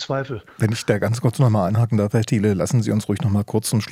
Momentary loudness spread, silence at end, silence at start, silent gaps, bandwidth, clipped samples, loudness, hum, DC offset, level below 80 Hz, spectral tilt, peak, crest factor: 5 LU; 0 s; 0 s; none; 15.5 kHz; under 0.1%; -20 LUFS; none; under 0.1%; -58 dBFS; -6.5 dB/octave; -2 dBFS; 18 dB